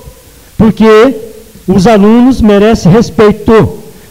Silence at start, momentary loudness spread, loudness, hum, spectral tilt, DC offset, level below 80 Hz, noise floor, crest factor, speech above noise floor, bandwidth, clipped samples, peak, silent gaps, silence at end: 0.05 s; 7 LU; -6 LUFS; none; -7 dB/octave; under 0.1%; -26 dBFS; -35 dBFS; 6 dB; 30 dB; 16 kHz; 0.9%; 0 dBFS; none; 0.2 s